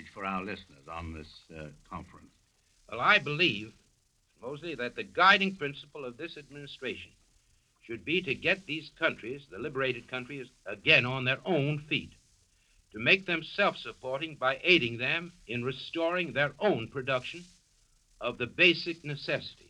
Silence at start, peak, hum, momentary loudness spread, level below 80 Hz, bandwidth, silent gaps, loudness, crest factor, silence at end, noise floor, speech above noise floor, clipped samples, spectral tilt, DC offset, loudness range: 0 s; -8 dBFS; none; 20 LU; -62 dBFS; 11 kHz; none; -29 LUFS; 24 dB; 0.15 s; -70 dBFS; 39 dB; under 0.1%; -5 dB/octave; under 0.1%; 5 LU